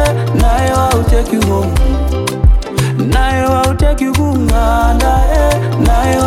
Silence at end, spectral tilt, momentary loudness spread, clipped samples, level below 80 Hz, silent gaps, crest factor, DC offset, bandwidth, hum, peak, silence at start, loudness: 0 s; -6 dB/octave; 3 LU; under 0.1%; -14 dBFS; none; 10 dB; under 0.1%; 15.5 kHz; none; 0 dBFS; 0 s; -13 LUFS